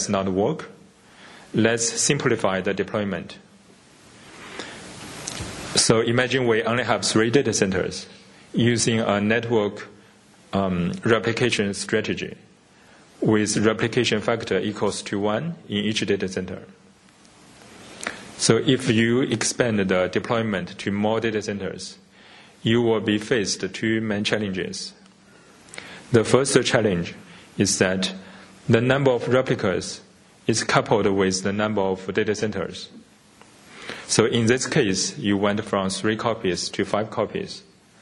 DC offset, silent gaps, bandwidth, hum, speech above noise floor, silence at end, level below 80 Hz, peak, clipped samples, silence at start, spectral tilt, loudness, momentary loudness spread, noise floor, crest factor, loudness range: under 0.1%; none; 11.5 kHz; none; 31 dB; 0.4 s; -56 dBFS; -2 dBFS; under 0.1%; 0 s; -4 dB/octave; -22 LUFS; 16 LU; -53 dBFS; 22 dB; 4 LU